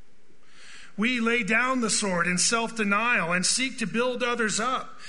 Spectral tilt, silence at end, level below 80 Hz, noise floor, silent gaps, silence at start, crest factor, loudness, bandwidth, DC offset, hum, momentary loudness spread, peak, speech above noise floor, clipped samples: -2.5 dB/octave; 0 s; -62 dBFS; -62 dBFS; none; 0.6 s; 18 dB; -24 LUFS; 11 kHz; 1%; none; 5 LU; -8 dBFS; 36 dB; under 0.1%